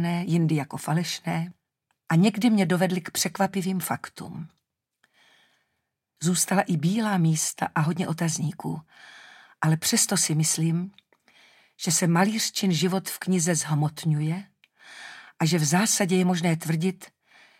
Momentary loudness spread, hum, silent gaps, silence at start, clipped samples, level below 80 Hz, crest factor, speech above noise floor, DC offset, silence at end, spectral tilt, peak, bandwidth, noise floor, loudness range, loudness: 13 LU; none; none; 0 s; under 0.1%; -72 dBFS; 20 dB; 55 dB; under 0.1%; 0.55 s; -4.5 dB/octave; -6 dBFS; 16.5 kHz; -79 dBFS; 4 LU; -24 LUFS